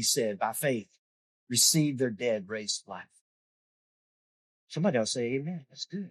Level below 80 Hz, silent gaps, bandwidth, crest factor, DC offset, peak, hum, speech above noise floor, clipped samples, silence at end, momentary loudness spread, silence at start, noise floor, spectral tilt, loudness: -78 dBFS; 0.98-1.47 s, 3.21-4.67 s; 13 kHz; 22 dB; under 0.1%; -10 dBFS; none; over 60 dB; under 0.1%; 0 s; 17 LU; 0 s; under -90 dBFS; -3 dB/octave; -29 LUFS